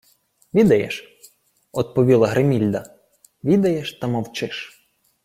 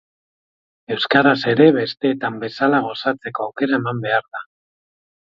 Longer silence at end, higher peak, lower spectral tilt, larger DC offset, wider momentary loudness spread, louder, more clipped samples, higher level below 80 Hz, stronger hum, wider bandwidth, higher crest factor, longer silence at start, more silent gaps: second, 0.55 s vs 0.8 s; second, -4 dBFS vs 0 dBFS; about the same, -7 dB/octave vs -7.5 dB/octave; neither; about the same, 14 LU vs 12 LU; about the same, -20 LUFS vs -18 LUFS; neither; first, -56 dBFS vs -64 dBFS; neither; first, 16 kHz vs 7.2 kHz; about the same, 18 dB vs 20 dB; second, 0.55 s vs 0.9 s; neither